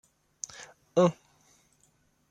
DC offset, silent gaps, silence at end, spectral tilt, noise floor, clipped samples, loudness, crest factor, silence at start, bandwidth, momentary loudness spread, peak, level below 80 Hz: under 0.1%; none; 1.2 s; -6 dB/octave; -68 dBFS; under 0.1%; -29 LUFS; 22 dB; 0.6 s; 9.8 kHz; 22 LU; -10 dBFS; -74 dBFS